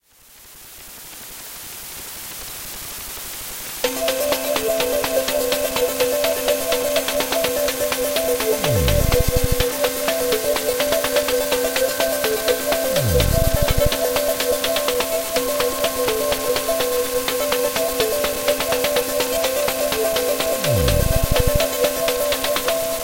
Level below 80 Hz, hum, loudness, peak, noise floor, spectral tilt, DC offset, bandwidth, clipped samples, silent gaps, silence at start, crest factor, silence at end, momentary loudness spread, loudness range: -30 dBFS; none; -20 LUFS; -2 dBFS; -47 dBFS; -3 dB/octave; 0.2%; 17 kHz; under 0.1%; none; 0.3 s; 18 dB; 0 s; 11 LU; 4 LU